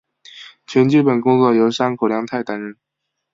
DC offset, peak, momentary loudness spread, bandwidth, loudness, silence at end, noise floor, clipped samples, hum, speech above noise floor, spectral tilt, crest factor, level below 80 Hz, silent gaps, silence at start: under 0.1%; -2 dBFS; 22 LU; 7.8 kHz; -16 LUFS; 0.6 s; -41 dBFS; under 0.1%; none; 26 dB; -7 dB/octave; 16 dB; -62 dBFS; none; 0.35 s